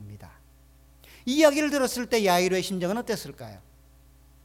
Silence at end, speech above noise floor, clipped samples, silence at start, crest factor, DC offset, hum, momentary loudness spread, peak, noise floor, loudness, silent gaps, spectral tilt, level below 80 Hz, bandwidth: 0.85 s; 31 dB; under 0.1%; 0 s; 20 dB; under 0.1%; none; 21 LU; -6 dBFS; -55 dBFS; -24 LUFS; none; -4 dB/octave; -56 dBFS; 18.5 kHz